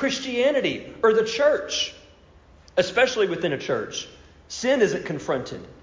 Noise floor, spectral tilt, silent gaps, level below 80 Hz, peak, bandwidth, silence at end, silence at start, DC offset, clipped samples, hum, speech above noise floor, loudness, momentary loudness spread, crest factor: -52 dBFS; -3.5 dB/octave; none; -56 dBFS; -8 dBFS; 7.6 kHz; 0.1 s; 0 s; under 0.1%; under 0.1%; none; 29 dB; -23 LUFS; 9 LU; 16 dB